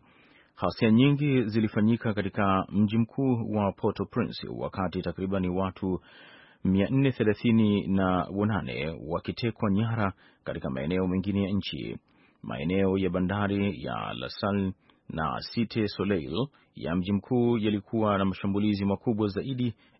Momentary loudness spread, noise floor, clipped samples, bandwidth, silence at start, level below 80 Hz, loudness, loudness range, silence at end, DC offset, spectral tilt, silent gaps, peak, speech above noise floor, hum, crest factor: 9 LU; -59 dBFS; under 0.1%; 5.8 kHz; 0.6 s; -56 dBFS; -28 LUFS; 5 LU; 0.25 s; under 0.1%; -11.5 dB/octave; none; -10 dBFS; 32 dB; none; 18 dB